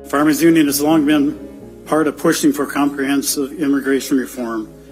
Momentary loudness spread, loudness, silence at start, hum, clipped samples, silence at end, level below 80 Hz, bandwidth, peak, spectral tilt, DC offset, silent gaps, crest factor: 12 LU; -16 LUFS; 0 s; none; under 0.1%; 0.1 s; -48 dBFS; 16 kHz; -2 dBFS; -4 dB/octave; under 0.1%; none; 14 dB